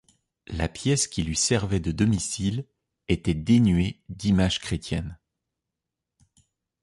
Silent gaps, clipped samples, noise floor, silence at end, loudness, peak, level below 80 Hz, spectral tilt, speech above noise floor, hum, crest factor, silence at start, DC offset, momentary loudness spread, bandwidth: none; under 0.1%; -85 dBFS; 1.65 s; -25 LUFS; -8 dBFS; -40 dBFS; -5 dB/octave; 61 dB; none; 18 dB; 0.5 s; under 0.1%; 11 LU; 11.5 kHz